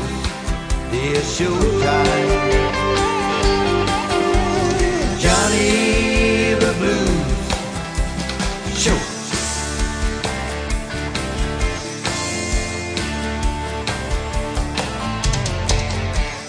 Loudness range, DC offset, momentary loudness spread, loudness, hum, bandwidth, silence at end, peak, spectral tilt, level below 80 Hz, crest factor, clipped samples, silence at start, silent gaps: 6 LU; under 0.1%; 8 LU; -19 LUFS; none; 10.5 kHz; 0 s; -2 dBFS; -4 dB/octave; -26 dBFS; 18 dB; under 0.1%; 0 s; none